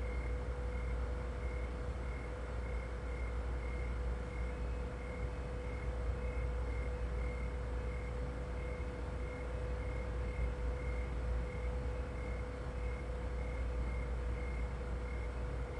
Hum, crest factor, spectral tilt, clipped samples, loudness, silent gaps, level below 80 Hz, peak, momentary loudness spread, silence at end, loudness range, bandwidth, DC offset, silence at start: none; 12 dB; -7 dB/octave; under 0.1%; -42 LUFS; none; -40 dBFS; -26 dBFS; 3 LU; 0 s; 1 LU; 9.8 kHz; under 0.1%; 0 s